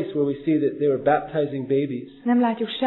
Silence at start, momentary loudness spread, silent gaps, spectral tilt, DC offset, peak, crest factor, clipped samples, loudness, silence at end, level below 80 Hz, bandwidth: 0 s; 5 LU; none; -10.5 dB/octave; under 0.1%; -8 dBFS; 16 dB; under 0.1%; -23 LUFS; 0 s; -60 dBFS; 4.2 kHz